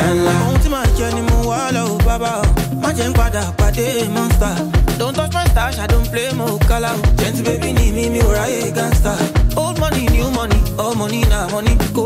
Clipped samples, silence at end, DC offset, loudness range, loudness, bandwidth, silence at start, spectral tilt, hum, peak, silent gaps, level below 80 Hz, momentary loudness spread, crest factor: under 0.1%; 0 s; under 0.1%; 1 LU; -16 LUFS; 16 kHz; 0 s; -5.5 dB/octave; none; -4 dBFS; none; -18 dBFS; 3 LU; 10 dB